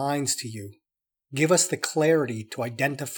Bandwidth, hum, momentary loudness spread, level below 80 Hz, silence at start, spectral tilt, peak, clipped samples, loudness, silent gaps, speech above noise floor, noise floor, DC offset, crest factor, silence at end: over 20 kHz; none; 15 LU; -80 dBFS; 0 s; -4 dB/octave; -6 dBFS; under 0.1%; -24 LUFS; none; 63 dB; -88 dBFS; under 0.1%; 20 dB; 0 s